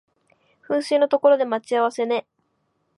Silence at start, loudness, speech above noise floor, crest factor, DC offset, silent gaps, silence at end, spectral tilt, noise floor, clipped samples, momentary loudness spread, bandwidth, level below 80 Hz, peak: 0.7 s; -21 LUFS; 51 dB; 18 dB; under 0.1%; none; 0.8 s; -4 dB/octave; -70 dBFS; under 0.1%; 8 LU; 11.5 kHz; -80 dBFS; -4 dBFS